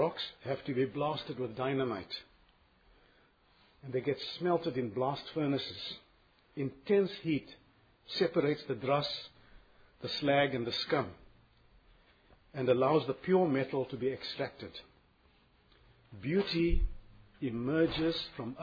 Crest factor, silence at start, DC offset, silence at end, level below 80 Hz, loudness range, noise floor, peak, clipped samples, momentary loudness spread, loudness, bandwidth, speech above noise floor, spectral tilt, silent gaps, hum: 18 dB; 0 s; under 0.1%; 0 s; -48 dBFS; 5 LU; -67 dBFS; -16 dBFS; under 0.1%; 13 LU; -34 LUFS; 5 kHz; 34 dB; -4.5 dB/octave; none; none